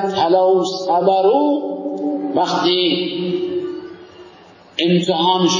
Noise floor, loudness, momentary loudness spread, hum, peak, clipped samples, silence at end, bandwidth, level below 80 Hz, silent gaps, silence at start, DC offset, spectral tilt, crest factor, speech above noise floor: -44 dBFS; -17 LUFS; 11 LU; none; -2 dBFS; under 0.1%; 0 s; 7.4 kHz; -64 dBFS; none; 0 s; under 0.1%; -5 dB/octave; 16 dB; 28 dB